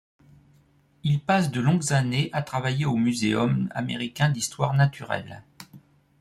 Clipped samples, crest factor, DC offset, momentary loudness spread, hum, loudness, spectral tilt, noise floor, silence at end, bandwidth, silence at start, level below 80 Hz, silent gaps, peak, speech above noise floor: under 0.1%; 18 dB; under 0.1%; 9 LU; none; -25 LUFS; -5.5 dB/octave; -60 dBFS; 0.45 s; 13.5 kHz; 1.05 s; -58 dBFS; none; -6 dBFS; 36 dB